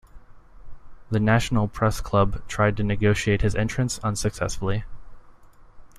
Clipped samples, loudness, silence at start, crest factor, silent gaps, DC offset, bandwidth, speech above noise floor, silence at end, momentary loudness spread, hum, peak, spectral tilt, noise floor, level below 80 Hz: under 0.1%; -24 LUFS; 0.15 s; 18 dB; none; under 0.1%; 15 kHz; 25 dB; 0 s; 7 LU; none; -6 dBFS; -6 dB/octave; -47 dBFS; -36 dBFS